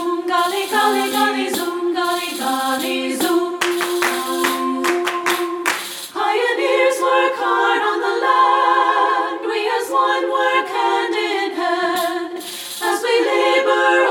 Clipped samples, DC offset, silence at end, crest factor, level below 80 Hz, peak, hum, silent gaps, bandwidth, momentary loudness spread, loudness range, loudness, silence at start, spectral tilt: under 0.1%; under 0.1%; 0 s; 14 dB; -72 dBFS; -4 dBFS; none; none; over 20 kHz; 6 LU; 3 LU; -18 LUFS; 0 s; -1.5 dB/octave